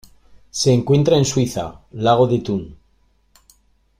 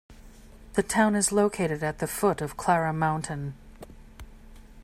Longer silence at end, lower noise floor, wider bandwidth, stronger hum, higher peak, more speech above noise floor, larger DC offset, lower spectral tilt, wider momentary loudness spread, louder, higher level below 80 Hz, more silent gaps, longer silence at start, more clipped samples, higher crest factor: first, 1.25 s vs 0 s; first, -59 dBFS vs -48 dBFS; about the same, 15 kHz vs 16 kHz; neither; first, -2 dBFS vs -8 dBFS; first, 42 dB vs 23 dB; neither; about the same, -6 dB/octave vs -5 dB/octave; first, 14 LU vs 11 LU; first, -18 LUFS vs -26 LUFS; about the same, -48 dBFS vs -50 dBFS; neither; first, 0.55 s vs 0.1 s; neither; about the same, 16 dB vs 20 dB